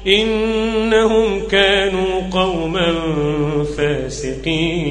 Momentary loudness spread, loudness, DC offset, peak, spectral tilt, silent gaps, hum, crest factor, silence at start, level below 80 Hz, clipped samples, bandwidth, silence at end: 6 LU; -17 LUFS; under 0.1%; 0 dBFS; -5 dB/octave; none; none; 16 dB; 0 s; -34 dBFS; under 0.1%; 10 kHz; 0 s